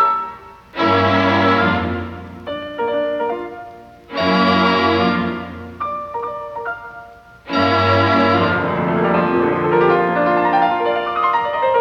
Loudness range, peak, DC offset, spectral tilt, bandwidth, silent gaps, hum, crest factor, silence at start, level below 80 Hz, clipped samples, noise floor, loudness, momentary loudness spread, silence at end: 4 LU; -4 dBFS; under 0.1%; -7 dB/octave; 8.4 kHz; none; none; 14 dB; 0 s; -52 dBFS; under 0.1%; -40 dBFS; -17 LUFS; 16 LU; 0 s